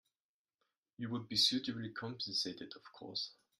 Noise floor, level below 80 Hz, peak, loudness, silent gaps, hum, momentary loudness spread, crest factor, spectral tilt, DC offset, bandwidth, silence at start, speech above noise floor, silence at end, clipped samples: under -90 dBFS; -80 dBFS; -20 dBFS; -37 LUFS; none; none; 18 LU; 22 dB; -3 dB/octave; under 0.1%; 14.5 kHz; 1 s; over 50 dB; 0.25 s; under 0.1%